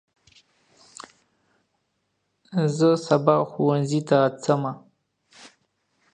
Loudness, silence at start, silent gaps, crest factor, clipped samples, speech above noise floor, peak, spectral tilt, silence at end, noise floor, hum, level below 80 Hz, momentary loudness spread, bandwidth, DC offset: -22 LUFS; 2.5 s; none; 22 dB; under 0.1%; 53 dB; -4 dBFS; -7 dB/octave; 0.65 s; -74 dBFS; none; -72 dBFS; 23 LU; 9.6 kHz; under 0.1%